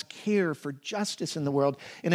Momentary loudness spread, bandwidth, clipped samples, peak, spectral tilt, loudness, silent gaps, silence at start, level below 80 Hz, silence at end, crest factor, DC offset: 8 LU; 15.5 kHz; under 0.1%; -10 dBFS; -5 dB/octave; -30 LUFS; none; 0.1 s; -80 dBFS; 0 s; 20 dB; under 0.1%